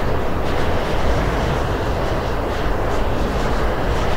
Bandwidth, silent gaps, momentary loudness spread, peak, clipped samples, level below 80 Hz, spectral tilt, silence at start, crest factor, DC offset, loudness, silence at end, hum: 16 kHz; none; 2 LU; -6 dBFS; under 0.1%; -24 dBFS; -6 dB/octave; 0 s; 12 dB; under 0.1%; -21 LUFS; 0 s; none